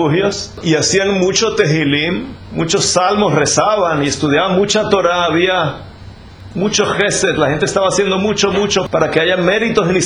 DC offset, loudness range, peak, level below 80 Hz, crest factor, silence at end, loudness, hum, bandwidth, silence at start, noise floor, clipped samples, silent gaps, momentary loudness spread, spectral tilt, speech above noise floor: under 0.1%; 2 LU; 0 dBFS; -42 dBFS; 14 dB; 0 s; -14 LUFS; none; 11 kHz; 0 s; -35 dBFS; under 0.1%; none; 6 LU; -4 dB/octave; 21 dB